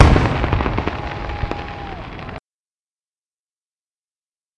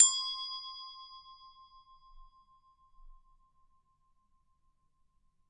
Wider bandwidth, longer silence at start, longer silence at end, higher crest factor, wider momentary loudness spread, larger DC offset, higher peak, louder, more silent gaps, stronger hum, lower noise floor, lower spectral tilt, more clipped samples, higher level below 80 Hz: about the same, 9.8 kHz vs 10 kHz; about the same, 0 s vs 0 s; second, 2.2 s vs 2.4 s; second, 20 dB vs 30 dB; second, 16 LU vs 25 LU; neither; first, 0 dBFS vs -8 dBFS; first, -21 LUFS vs -32 LUFS; neither; neither; first, under -90 dBFS vs -72 dBFS; first, -7 dB/octave vs 5.5 dB/octave; neither; first, -26 dBFS vs -64 dBFS